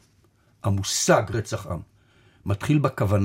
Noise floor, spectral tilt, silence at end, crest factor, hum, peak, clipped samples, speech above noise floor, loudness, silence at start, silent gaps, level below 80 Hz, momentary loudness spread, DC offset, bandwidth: -61 dBFS; -5 dB/octave; 0 s; 20 dB; none; -4 dBFS; under 0.1%; 38 dB; -24 LUFS; 0.65 s; none; -52 dBFS; 14 LU; under 0.1%; 16.5 kHz